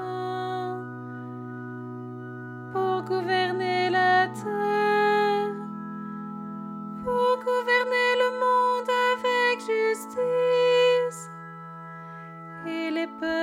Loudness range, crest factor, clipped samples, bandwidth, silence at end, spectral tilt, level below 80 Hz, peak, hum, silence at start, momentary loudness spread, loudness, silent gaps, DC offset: 5 LU; 16 dB; under 0.1%; 15.5 kHz; 0 s; -5 dB/octave; -70 dBFS; -10 dBFS; none; 0 s; 17 LU; -25 LUFS; none; under 0.1%